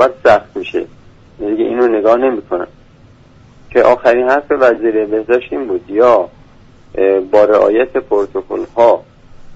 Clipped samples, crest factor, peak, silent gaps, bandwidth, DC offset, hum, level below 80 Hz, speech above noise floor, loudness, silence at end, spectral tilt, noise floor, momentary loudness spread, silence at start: under 0.1%; 14 dB; 0 dBFS; none; 7.8 kHz; under 0.1%; none; -46 dBFS; 31 dB; -13 LUFS; 0 s; -6.5 dB/octave; -43 dBFS; 12 LU; 0 s